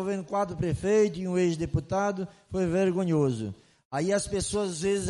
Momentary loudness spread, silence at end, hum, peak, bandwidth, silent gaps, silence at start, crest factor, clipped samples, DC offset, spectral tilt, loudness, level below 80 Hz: 8 LU; 0 s; none; -12 dBFS; 11.5 kHz; 3.85-3.91 s; 0 s; 14 dB; under 0.1%; under 0.1%; -6 dB/octave; -28 LUFS; -50 dBFS